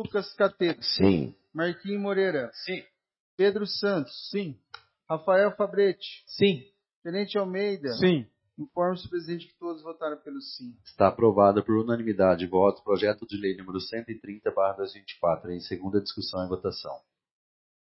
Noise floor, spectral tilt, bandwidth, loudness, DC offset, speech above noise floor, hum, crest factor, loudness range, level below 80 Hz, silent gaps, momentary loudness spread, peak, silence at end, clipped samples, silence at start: under -90 dBFS; -9.5 dB/octave; 5.8 kHz; -27 LUFS; under 0.1%; over 63 dB; none; 22 dB; 6 LU; -64 dBFS; 3.20-3.38 s, 6.96-7.02 s; 15 LU; -6 dBFS; 0.95 s; under 0.1%; 0 s